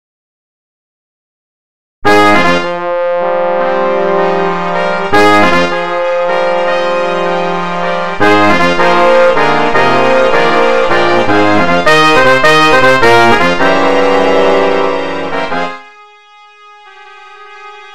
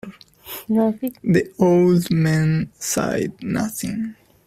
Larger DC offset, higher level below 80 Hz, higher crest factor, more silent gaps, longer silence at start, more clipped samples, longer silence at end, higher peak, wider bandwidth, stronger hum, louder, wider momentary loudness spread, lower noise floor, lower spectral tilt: first, 10% vs under 0.1%; first, -40 dBFS vs -52 dBFS; second, 12 dB vs 18 dB; neither; first, 2 s vs 0.05 s; neither; second, 0 s vs 0.35 s; about the same, 0 dBFS vs -2 dBFS; about the same, 16 kHz vs 16 kHz; neither; first, -9 LUFS vs -20 LUFS; second, 9 LU vs 13 LU; about the same, -39 dBFS vs -39 dBFS; second, -4.5 dB/octave vs -6 dB/octave